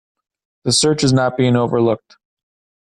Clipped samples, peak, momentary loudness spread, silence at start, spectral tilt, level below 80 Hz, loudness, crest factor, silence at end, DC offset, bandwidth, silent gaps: under 0.1%; -4 dBFS; 8 LU; 0.65 s; -5 dB/octave; -50 dBFS; -16 LUFS; 14 dB; 0.95 s; under 0.1%; 12 kHz; none